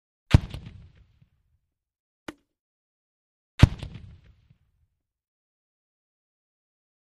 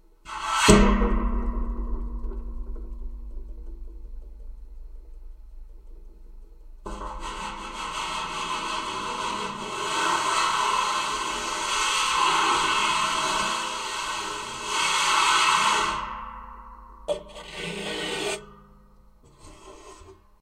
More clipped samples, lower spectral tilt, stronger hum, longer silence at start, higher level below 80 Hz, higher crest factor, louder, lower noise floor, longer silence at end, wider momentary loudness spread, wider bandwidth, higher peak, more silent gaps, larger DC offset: neither; first, -7 dB/octave vs -2.5 dB/octave; neither; about the same, 0.3 s vs 0.25 s; about the same, -38 dBFS vs -36 dBFS; about the same, 28 dB vs 26 dB; about the same, -23 LUFS vs -25 LUFS; first, -75 dBFS vs -54 dBFS; first, 3.15 s vs 0.3 s; about the same, 24 LU vs 23 LU; second, 12.5 kHz vs 15.5 kHz; about the same, -2 dBFS vs 0 dBFS; first, 2.00-2.26 s, 2.60-3.58 s vs none; neither